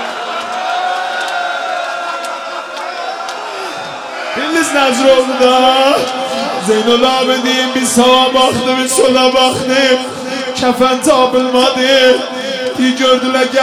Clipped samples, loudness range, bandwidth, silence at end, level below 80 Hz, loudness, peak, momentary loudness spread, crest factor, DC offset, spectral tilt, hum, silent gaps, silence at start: under 0.1%; 8 LU; 16 kHz; 0 s; -50 dBFS; -12 LUFS; 0 dBFS; 12 LU; 12 dB; under 0.1%; -2.5 dB/octave; none; none; 0 s